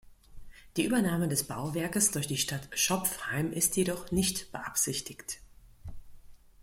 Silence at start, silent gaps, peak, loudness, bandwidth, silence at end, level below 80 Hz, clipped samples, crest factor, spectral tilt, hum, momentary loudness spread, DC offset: 0.05 s; none; -12 dBFS; -30 LUFS; 16.5 kHz; 0 s; -54 dBFS; under 0.1%; 20 dB; -3.5 dB/octave; none; 14 LU; under 0.1%